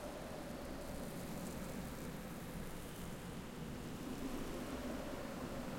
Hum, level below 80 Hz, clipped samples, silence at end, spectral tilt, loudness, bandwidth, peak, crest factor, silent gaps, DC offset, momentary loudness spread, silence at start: none; -54 dBFS; under 0.1%; 0 s; -5 dB/octave; -47 LUFS; 16.5 kHz; -32 dBFS; 14 dB; none; under 0.1%; 3 LU; 0 s